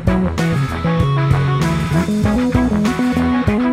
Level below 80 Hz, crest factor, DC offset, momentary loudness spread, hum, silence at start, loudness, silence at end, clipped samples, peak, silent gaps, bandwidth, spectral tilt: -28 dBFS; 16 dB; under 0.1%; 2 LU; none; 0 s; -16 LUFS; 0 s; under 0.1%; 0 dBFS; none; 15 kHz; -7 dB/octave